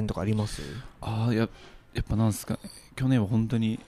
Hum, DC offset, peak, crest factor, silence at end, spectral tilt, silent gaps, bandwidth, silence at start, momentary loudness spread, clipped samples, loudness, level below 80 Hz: none; under 0.1%; -12 dBFS; 16 dB; 0.05 s; -7 dB/octave; none; 15 kHz; 0 s; 12 LU; under 0.1%; -29 LUFS; -44 dBFS